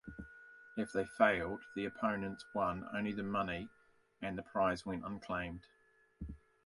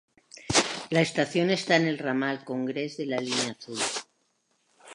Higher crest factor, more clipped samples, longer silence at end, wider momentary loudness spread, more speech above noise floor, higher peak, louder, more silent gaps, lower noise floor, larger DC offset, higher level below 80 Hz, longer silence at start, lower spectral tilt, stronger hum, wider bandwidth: about the same, 24 dB vs 24 dB; neither; first, 0.3 s vs 0 s; first, 20 LU vs 8 LU; second, 20 dB vs 45 dB; second, -16 dBFS vs -6 dBFS; second, -38 LUFS vs -27 LUFS; neither; second, -58 dBFS vs -72 dBFS; neither; about the same, -60 dBFS vs -60 dBFS; second, 0.05 s vs 0.35 s; first, -6.5 dB/octave vs -3.5 dB/octave; neither; about the same, 11.5 kHz vs 11.5 kHz